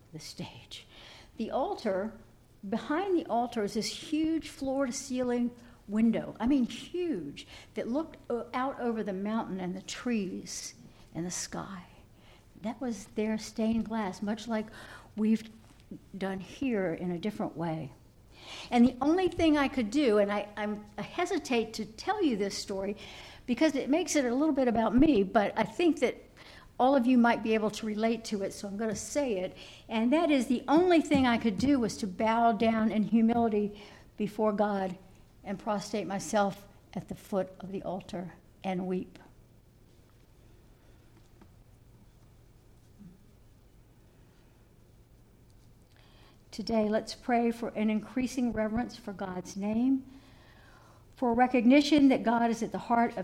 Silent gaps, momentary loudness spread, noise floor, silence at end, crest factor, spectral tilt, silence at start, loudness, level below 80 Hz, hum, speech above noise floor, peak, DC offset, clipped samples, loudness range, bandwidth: none; 17 LU; -59 dBFS; 0 s; 20 dB; -5 dB/octave; 0.15 s; -30 LUFS; -56 dBFS; none; 29 dB; -12 dBFS; under 0.1%; under 0.1%; 9 LU; 14.5 kHz